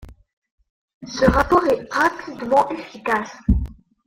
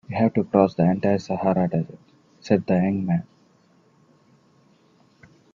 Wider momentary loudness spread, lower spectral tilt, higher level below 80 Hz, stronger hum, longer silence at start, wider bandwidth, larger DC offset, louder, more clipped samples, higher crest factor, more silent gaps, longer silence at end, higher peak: first, 12 LU vs 8 LU; second, -6 dB/octave vs -9 dB/octave; first, -32 dBFS vs -62 dBFS; neither; about the same, 0 s vs 0.1 s; first, 16.5 kHz vs 7.4 kHz; neither; about the same, -20 LUFS vs -22 LUFS; neither; about the same, 20 dB vs 22 dB; first, 0.33-0.42 s, 0.51-0.58 s, 0.70-0.88 s, 0.94-1.01 s vs none; second, 0.35 s vs 2.3 s; about the same, -2 dBFS vs -2 dBFS